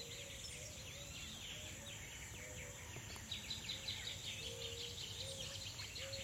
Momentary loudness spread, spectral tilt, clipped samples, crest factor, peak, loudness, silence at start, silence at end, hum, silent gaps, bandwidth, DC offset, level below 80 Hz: 6 LU; -2 dB/octave; under 0.1%; 16 dB; -32 dBFS; -47 LUFS; 0 s; 0 s; none; none; 16.5 kHz; under 0.1%; -62 dBFS